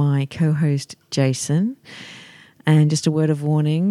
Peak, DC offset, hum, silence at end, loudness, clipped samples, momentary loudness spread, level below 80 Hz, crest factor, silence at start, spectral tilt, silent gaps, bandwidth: -4 dBFS; under 0.1%; none; 0 s; -20 LUFS; under 0.1%; 20 LU; -62 dBFS; 16 dB; 0 s; -6.5 dB/octave; none; 12 kHz